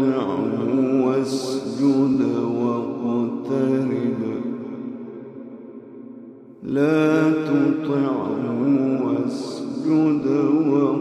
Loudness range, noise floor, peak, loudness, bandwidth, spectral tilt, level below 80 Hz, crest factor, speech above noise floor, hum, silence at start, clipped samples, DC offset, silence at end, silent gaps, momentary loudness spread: 6 LU; -41 dBFS; -8 dBFS; -21 LUFS; 10.5 kHz; -7.5 dB/octave; -68 dBFS; 14 dB; 22 dB; none; 0 s; under 0.1%; under 0.1%; 0 s; none; 18 LU